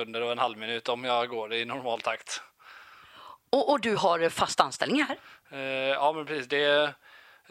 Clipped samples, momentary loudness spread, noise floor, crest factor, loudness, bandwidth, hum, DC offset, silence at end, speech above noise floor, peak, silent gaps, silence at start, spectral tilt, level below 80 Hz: under 0.1%; 10 LU; -52 dBFS; 24 dB; -28 LUFS; 15.5 kHz; none; under 0.1%; 0.35 s; 24 dB; -6 dBFS; none; 0 s; -3 dB/octave; -70 dBFS